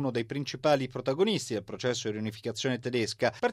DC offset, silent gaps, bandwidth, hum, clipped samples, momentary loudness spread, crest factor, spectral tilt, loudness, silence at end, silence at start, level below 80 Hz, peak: under 0.1%; none; 14.5 kHz; none; under 0.1%; 7 LU; 18 dB; -4.5 dB/octave; -30 LUFS; 0 s; 0 s; -66 dBFS; -12 dBFS